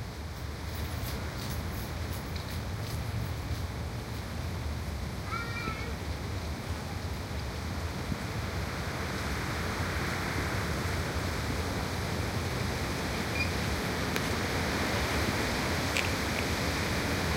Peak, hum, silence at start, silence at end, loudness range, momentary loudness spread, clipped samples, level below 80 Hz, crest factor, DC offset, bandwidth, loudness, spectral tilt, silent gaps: -10 dBFS; none; 0 s; 0 s; 6 LU; 7 LU; under 0.1%; -40 dBFS; 24 dB; under 0.1%; 16 kHz; -33 LUFS; -4.5 dB/octave; none